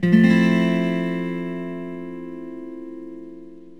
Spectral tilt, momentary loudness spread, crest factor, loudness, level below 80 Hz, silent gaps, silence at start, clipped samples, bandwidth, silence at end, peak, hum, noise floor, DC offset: -8 dB/octave; 22 LU; 18 dB; -20 LUFS; -72 dBFS; none; 0 s; under 0.1%; 8.4 kHz; 0.05 s; -4 dBFS; none; -41 dBFS; 0.5%